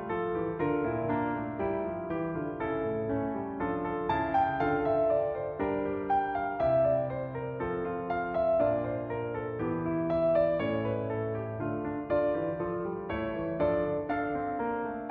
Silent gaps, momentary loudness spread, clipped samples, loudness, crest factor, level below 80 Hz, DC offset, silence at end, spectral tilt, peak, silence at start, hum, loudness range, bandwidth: none; 7 LU; under 0.1%; -31 LUFS; 14 dB; -54 dBFS; under 0.1%; 0 s; -7 dB/octave; -16 dBFS; 0 s; none; 3 LU; 4.9 kHz